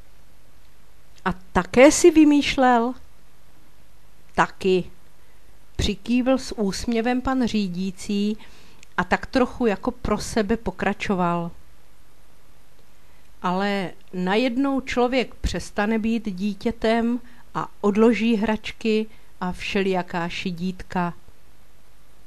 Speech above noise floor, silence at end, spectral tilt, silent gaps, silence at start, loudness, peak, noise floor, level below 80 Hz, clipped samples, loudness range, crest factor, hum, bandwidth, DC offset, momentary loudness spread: 33 dB; 1.15 s; -5 dB/octave; none; 1.25 s; -22 LUFS; 0 dBFS; -55 dBFS; -42 dBFS; under 0.1%; 9 LU; 22 dB; none; 13 kHz; 2%; 12 LU